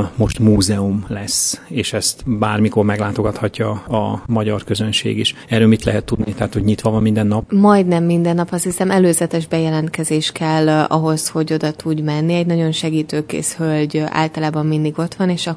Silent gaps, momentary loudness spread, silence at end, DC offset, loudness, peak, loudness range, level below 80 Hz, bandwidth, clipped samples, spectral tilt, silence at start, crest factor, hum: none; 7 LU; 0 s; under 0.1%; -17 LUFS; 0 dBFS; 3 LU; -40 dBFS; 11 kHz; under 0.1%; -5 dB/octave; 0 s; 16 dB; none